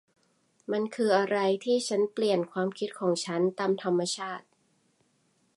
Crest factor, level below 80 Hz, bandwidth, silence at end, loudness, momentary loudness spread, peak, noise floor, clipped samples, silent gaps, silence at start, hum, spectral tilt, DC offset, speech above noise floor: 18 dB; -82 dBFS; 11.5 kHz; 1.15 s; -28 LUFS; 8 LU; -12 dBFS; -70 dBFS; under 0.1%; none; 0.7 s; none; -4.5 dB/octave; under 0.1%; 42 dB